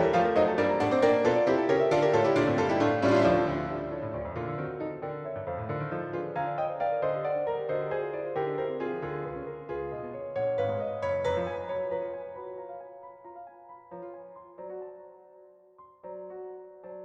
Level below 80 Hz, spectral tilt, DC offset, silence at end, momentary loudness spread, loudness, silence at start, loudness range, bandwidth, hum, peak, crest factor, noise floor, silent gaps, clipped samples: -58 dBFS; -7 dB/octave; under 0.1%; 0 s; 21 LU; -29 LUFS; 0 s; 20 LU; 9 kHz; none; -12 dBFS; 18 dB; -56 dBFS; none; under 0.1%